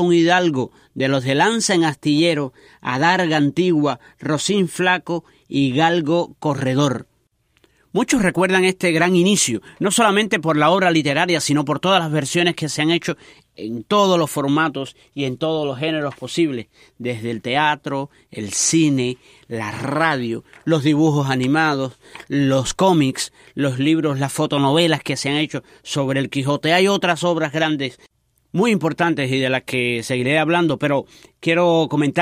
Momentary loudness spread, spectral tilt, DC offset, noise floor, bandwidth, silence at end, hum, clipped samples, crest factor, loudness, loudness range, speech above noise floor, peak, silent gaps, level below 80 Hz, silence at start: 11 LU; -4.5 dB/octave; under 0.1%; -63 dBFS; 15.5 kHz; 0 s; none; under 0.1%; 16 dB; -18 LUFS; 4 LU; 45 dB; -2 dBFS; none; -56 dBFS; 0 s